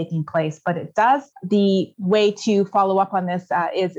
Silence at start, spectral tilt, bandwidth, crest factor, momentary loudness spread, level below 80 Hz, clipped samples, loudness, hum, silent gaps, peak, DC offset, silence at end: 0 s; -6.5 dB/octave; 8 kHz; 14 dB; 6 LU; -70 dBFS; under 0.1%; -20 LUFS; none; none; -6 dBFS; under 0.1%; 0 s